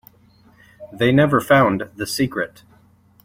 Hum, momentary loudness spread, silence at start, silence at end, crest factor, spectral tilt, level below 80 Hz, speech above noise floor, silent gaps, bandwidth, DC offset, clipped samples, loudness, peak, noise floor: none; 11 LU; 0.8 s; 0.75 s; 18 dB; -6 dB/octave; -52 dBFS; 36 dB; none; 16.5 kHz; under 0.1%; under 0.1%; -18 LUFS; -2 dBFS; -53 dBFS